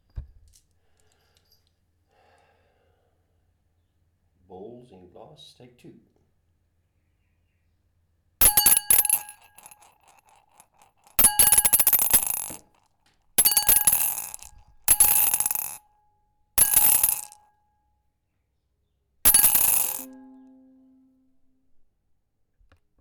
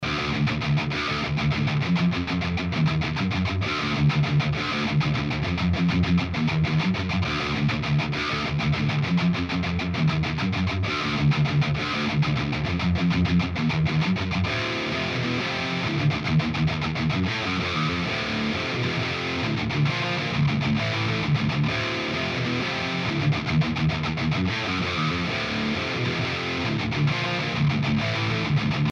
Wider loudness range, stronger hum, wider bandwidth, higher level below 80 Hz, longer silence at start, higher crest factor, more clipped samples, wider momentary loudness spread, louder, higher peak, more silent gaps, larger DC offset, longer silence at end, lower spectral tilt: first, 4 LU vs 1 LU; neither; first, 19.5 kHz vs 7.4 kHz; second, -48 dBFS vs -42 dBFS; first, 0.15 s vs 0 s; first, 22 dB vs 12 dB; neither; first, 14 LU vs 3 LU; first, -18 LUFS vs -24 LUFS; first, -4 dBFS vs -12 dBFS; neither; neither; first, 2.9 s vs 0 s; second, 0.5 dB/octave vs -6 dB/octave